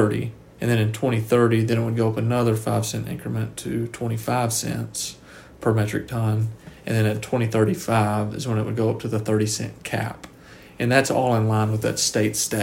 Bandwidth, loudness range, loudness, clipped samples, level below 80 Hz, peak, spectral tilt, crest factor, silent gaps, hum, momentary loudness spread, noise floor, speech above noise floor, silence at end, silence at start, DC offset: 16.5 kHz; 3 LU; -23 LUFS; under 0.1%; -52 dBFS; -4 dBFS; -5.5 dB/octave; 18 dB; none; none; 9 LU; -46 dBFS; 24 dB; 0 s; 0 s; under 0.1%